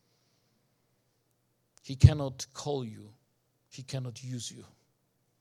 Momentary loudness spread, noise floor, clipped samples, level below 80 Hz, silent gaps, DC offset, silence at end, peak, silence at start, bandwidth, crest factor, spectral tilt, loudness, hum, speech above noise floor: 23 LU; -75 dBFS; under 0.1%; -44 dBFS; none; under 0.1%; 0.8 s; -4 dBFS; 1.85 s; 12 kHz; 28 dB; -6.5 dB/octave; -30 LUFS; none; 46 dB